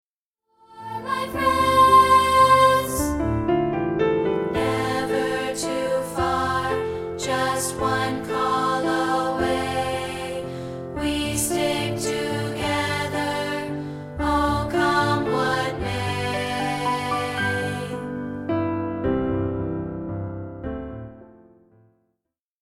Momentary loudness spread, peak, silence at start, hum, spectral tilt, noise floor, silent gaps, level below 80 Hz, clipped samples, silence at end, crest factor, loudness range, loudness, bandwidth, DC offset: 14 LU; -4 dBFS; 0.7 s; none; -4.5 dB/octave; -81 dBFS; none; -42 dBFS; under 0.1%; 1.35 s; 18 dB; 9 LU; -22 LUFS; 16.5 kHz; under 0.1%